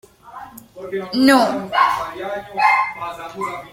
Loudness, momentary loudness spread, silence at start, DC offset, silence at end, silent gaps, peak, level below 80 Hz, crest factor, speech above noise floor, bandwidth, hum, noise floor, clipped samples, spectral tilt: -18 LUFS; 23 LU; 0.25 s; under 0.1%; 0 s; none; -2 dBFS; -56 dBFS; 18 dB; 20 dB; 16.5 kHz; none; -38 dBFS; under 0.1%; -4 dB/octave